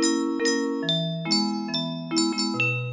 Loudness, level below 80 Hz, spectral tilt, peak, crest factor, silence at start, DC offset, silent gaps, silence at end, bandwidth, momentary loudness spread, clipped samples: -24 LUFS; -74 dBFS; -3.5 dB/octave; -10 dBFS; 16 dB; 0 s; under 0.1%; none; 0 s; 7.8 kHz; 4 LU; under 0.1%